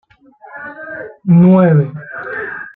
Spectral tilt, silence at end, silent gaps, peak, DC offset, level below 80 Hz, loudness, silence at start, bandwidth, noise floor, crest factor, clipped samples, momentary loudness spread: -13 dB/octave; 0.05 s; none; -2 dBFS; under 0.1%; -56 dBFS; -12 LUFS; 0.55 s; 3.6 kHz; -42 dBFS; 12 dB; under 0.1%; 20 LU